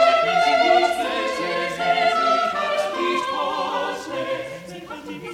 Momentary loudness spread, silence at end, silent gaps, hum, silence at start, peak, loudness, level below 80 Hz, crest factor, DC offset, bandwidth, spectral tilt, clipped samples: 17 LU; 0 s; none; none; 0 s; -4 dBFS; -21 LUFS; -58 dBFS; 16 dB; under 0.1%; 14.5 kHz; -3 dB/octave; under 0.1%